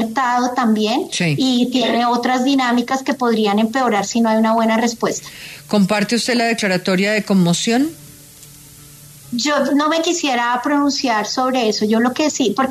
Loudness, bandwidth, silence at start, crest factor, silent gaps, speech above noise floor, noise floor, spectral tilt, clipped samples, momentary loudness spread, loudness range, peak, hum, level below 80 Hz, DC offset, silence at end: -17 LUFS; 14 kHz; 0 s; 14 dB; none; 24 dB; -41 dBFS; -4.5 dB/octave; under 0.1%; 3 LU; 3 LU; -4 dBFS; none; -58 dBFS; under 0.1%; 0 s